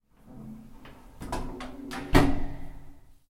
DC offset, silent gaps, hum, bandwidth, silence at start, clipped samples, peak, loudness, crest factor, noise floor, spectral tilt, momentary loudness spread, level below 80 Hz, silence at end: under 0.1%; none; none; 15.5 kHz; 0.25 s; under 0.1%; -4 dBFS; -29 LUFS; 26 dB; -48 dBFS; -6 dB/octave; 25 LU; -36 dBFS; 0.15 s